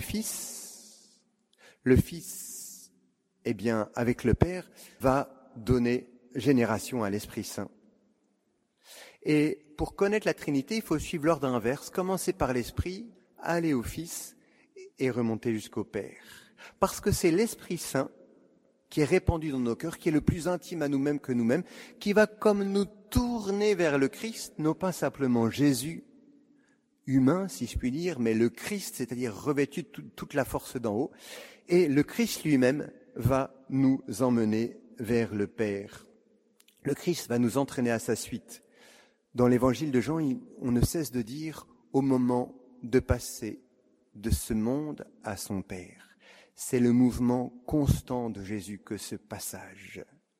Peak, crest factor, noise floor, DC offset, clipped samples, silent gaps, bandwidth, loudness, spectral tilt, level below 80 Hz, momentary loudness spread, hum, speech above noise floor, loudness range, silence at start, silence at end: -6 dBFS; 24 dB; -74 dBFS; under 0.1%; under 0.1%; none; 16 kHz; -29 LUFS; -6 dB/octave; -48 dBFS; 15 LU; none; 45 dB; 5 LU; 0 s; 0.35 s